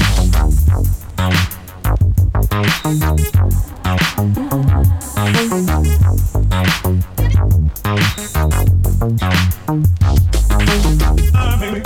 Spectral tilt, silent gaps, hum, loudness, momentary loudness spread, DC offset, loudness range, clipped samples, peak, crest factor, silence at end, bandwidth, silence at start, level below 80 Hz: -5.5 dB/octave; none; none; -15 LUFS; 4 LU; under 0.1%; 1 LU; under 0.1%; -2 dBFS; 12 dB; 0 s; 17.5 kHz; 0 s; -18 dBFS